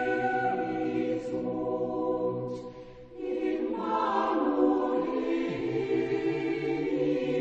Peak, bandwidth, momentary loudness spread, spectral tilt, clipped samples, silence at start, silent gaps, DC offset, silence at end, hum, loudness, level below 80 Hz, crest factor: -12 dBFS; 8 kHz; 9 LU; -7.5 dB/octave; under 0.1%; 0 s; none; under 0.1%; 0 s; none; -29 LUFS; -60 dBFS; 16 dB